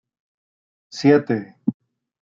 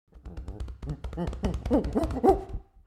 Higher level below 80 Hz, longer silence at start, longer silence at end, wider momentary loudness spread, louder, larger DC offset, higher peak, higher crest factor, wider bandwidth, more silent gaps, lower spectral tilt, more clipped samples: second, -70 dBFS vs -36 dBFS; first, 0.95 s vs 0.15 s; first, 0.65 s vs 0.25 s; second, 11 LU vs 18 LU; first, -20 LUFS vs -29 LUFS; neither; first, -4 dBFS vs -8 dBFS; about the same, 20 dB vs 22 dB; second, 7.6 kHz vs 13.5 kHz; neither; about the same, -7 dB/octave vs -8 dB/octave; neither